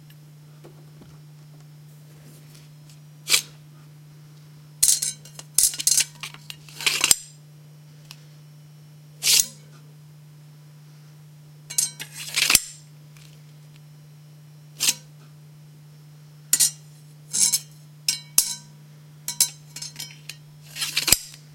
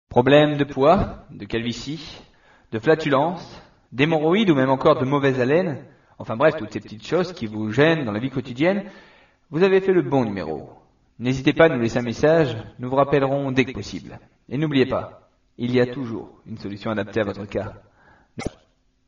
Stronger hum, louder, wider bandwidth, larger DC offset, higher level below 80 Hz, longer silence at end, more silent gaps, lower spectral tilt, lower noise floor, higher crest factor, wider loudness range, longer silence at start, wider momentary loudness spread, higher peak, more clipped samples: neither; about the same, -21 LUFS vs -21 LUFS; first, 16.5 kHz vs 7.2 kHz; neither; second, -58 dBFS vs -48 dBFS; second, 0.2 s vs 0.6 s; neither; second, 0.5 dB/octave vs -5 dB/octave; second, -47 dBFS vs -61 dBFS; first, 28 dB vs 20 dB; first, 8 LU vs 5 LU; first, 0.65 s vs 0.1 s; first, 22 LU vs 17 LU; about the same, 0 dBFS vs -2 dBFS; neither